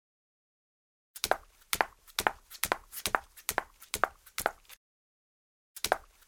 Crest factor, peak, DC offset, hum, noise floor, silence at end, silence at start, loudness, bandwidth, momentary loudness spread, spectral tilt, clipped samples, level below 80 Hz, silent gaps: 32 dB; -4 dBFS; under 0.1%; none; under -90 dBFS; 0.25 s; 1.15 s; -34 LUFS; over 20 kHz; 5 LU; -1 dB/octave; under 0.1%; -58 dBFS; 4.77-5.75 s